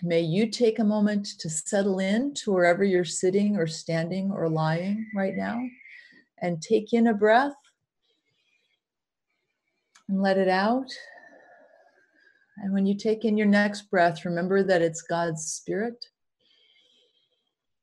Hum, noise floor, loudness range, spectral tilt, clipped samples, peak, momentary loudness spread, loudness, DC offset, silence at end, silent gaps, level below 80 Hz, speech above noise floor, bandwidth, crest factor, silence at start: none; -89 dBFS; 5 LU; -5.5 dB/octave; under 0.1%; -8 dBFS; 10 LU; -25 LUFS; under 0.1%; 1.85 s; none; -72 dBFS; 64 dB; 11.5 kHz; 18 dB; 0 s